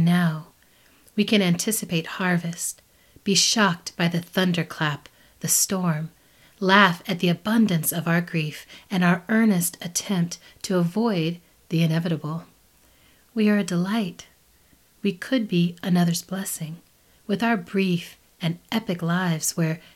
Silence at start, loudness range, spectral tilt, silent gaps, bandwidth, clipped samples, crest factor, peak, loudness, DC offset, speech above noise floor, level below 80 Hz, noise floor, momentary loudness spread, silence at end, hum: 0 s; 5 LU; -4.5 dB/octave; none; 16 kHz; under 0.1%; 24 dB; 0 dBFS; -23 LUFS; under 0.1%; 36 dB; -64 dBFS; -58 dBFS; 13 LU; 0.15 s; none